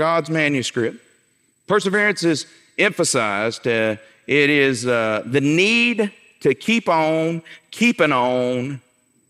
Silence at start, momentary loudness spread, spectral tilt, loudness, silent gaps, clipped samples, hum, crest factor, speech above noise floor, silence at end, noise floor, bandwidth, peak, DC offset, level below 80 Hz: 0 s; 10 LU; -4 dB/octave; -19 LUFS; none; under 0.1%; none; 16 dB; 44 dB; 0.5 s; -62 dBFS; 15 kHz; -4 dBFS; under 0.1%; -70 dBFS